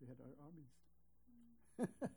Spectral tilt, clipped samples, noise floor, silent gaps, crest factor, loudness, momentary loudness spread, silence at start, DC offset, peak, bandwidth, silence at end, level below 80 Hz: -7.5 dB/octave; under 0.1%; -78 dBFS; none; 24 dB; -52 LUFS; 22 LU; 0 s; under 0.1%; -30 dBFS; over 20 kHz; 0 s; -80 dBFS